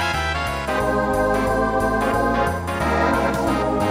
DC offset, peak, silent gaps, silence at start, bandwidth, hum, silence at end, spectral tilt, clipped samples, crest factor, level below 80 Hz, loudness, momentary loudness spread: under 0.1%; -6 dBFS; none; 0 s; 16 kHz; none; 0 s; -5.5 dB/octave; under 0.1%; 14 dB; -32 dBFS; -20 LUFS; 3 LU